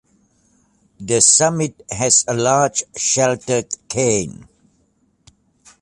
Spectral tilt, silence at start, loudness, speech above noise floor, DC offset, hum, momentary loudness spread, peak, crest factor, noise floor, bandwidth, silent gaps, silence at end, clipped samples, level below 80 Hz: -3 dB/octave; 1 s; -16 LUFS; 44 dB; under 0.1%; none; 13 LU; 0 dBFS; 20 dB; -62 dBFS; 11.5 kHz; none; 1.4 s; under 0.1%; -52 dBFS